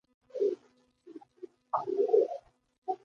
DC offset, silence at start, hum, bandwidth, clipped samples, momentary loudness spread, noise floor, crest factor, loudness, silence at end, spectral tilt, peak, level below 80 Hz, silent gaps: under 0.1%; 0.35 s; none; 6.6 kHz; under 0.1%; 25 LU; -67 dBFS; 20 dB; -31 LUFS; 0.1 s; -7 dB/octave; -14 dBFS; -82 dBFS; 2.78-2.82 s